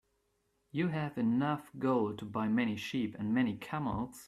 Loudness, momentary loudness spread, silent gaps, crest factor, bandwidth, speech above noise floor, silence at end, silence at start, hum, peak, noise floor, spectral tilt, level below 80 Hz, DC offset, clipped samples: -34 LUFS; 5 LU; none; 14 dB; 14 kHz; 44 dB; 0 s; 0.75 s; none; -20 dBFS; -78 dBFS; -7 dB/octave; -64 dBFS; under 0.1%; under 0.1%